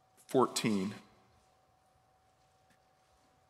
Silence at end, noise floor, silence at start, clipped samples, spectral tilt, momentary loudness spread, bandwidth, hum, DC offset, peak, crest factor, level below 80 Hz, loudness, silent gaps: 2.5 s; -70 dBFS; 0.3 s; under 0.1%; -4.5 dB/octave; 12 LU; 16 kHz; none; under 0.1%; -14 dBFS; 24 dB; -82 dBFS; -33 LUFS; none